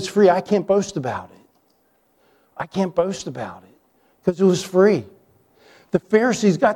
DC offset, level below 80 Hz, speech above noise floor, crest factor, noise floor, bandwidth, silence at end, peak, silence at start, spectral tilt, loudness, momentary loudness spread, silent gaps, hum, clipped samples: under 0.1%; -60 dBFS; 44 dB; 18 dB; -63 dBFS; 13.5 kHz; 0 s; -2 dBFS; 0 s; -6 dB/octave; -20 LUFS; 15 LU; none; none; under 0.1%